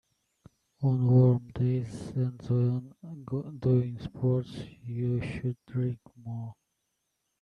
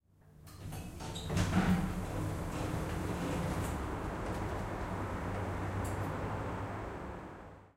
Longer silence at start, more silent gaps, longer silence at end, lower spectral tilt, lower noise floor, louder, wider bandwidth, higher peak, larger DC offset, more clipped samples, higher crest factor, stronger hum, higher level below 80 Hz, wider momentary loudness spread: first, 0.8 s vs 0.25 s; neither; first, 0.9 s vs 0.05 s; first, -10 dB/octave vs -6 dB/octave; first, -80 dBFS vs -58 dBFS; first, -29 LUFS vs -38 LUFS; second, 5.2 kHz vs 16 kHz; first, -12 dBFS vs -18 dBFS; neither; neither; about the same, 18 dB vs 18 dB; neither; second, -58 dBFS vs -46 dBFS; first, 18 LU vs 13 LU